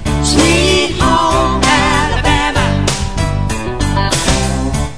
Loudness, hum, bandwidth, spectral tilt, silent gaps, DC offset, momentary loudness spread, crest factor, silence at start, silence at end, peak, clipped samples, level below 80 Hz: -13 LUFS; none; 11 kHz; -4 dB/octave; none; 4%; 7 LU; 12 dB; 0 s; 0 s; 0 dBFS; under 0.1%; -20 dBFS